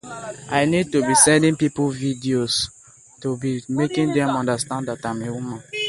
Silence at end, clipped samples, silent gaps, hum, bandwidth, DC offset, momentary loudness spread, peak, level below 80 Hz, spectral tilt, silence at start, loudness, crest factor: 0 s; under 0.1%; none; none; 11.5 kHz; under 0.1%; 15 LU; -2 dBFS; -54 dBFS; -4 dB/octave; 0.05 s; -20 LUFS; 20 dB